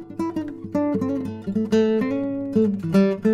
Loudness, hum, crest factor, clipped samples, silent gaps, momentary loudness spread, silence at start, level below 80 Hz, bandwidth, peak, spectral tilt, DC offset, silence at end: -23 LUFS; none; 14 dB; under 0.1%; none; 8 LU; 0 s; -56 dBFS; 11 kHz; -8 dBFS; -8 dB/octave; under 0.1%; 0 s